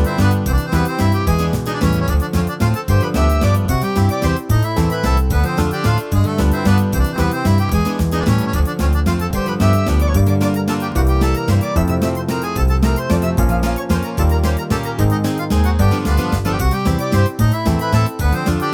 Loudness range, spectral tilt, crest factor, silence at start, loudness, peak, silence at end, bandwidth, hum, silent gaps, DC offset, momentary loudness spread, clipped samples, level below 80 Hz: 1 LU; -6.5 dB/octave; 14 dB; 0 s; -17 LUFS; -2 dBFS; 0 s; 19 kHz; none; none; under 0.1%; 3 LU; under 0.1%; -22 dBFS